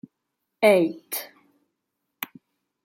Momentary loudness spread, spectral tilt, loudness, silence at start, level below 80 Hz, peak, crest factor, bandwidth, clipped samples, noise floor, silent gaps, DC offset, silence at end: 18 LU; -4.5 dB/octave; -22 LUFS; 0.6 s; -78 dBFS; -4 dBFS; 22 dB; 16.5 kHz; under 0.1%; -80 dBFS; none; under 0.1%; 0.6 s